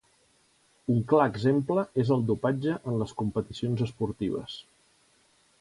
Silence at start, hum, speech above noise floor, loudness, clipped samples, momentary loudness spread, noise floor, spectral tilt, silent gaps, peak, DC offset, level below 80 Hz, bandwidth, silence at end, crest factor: 0.9 s; none; 38 dB; -28 LUFS; under 0.1%; 8 LU; -65 dBFS; -8 dB/octave; none; -10 dBFS; under 0.1%; -58 dBFS; 11.5 kHz; 1 s; 20 dB